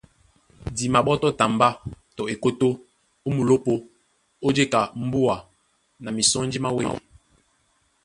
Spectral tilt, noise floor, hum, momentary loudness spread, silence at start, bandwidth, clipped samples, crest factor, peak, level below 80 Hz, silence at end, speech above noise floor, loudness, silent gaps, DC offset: -4.5 dB/octave; -66 dBFS; none; 14 LU; 0.65 s; 11.5 kHz; under 0.1%; 20 dB; -4 dBFS; -52 dBFS; 1.05 s; 44 dB; -23 LUFS; none; under 0.1%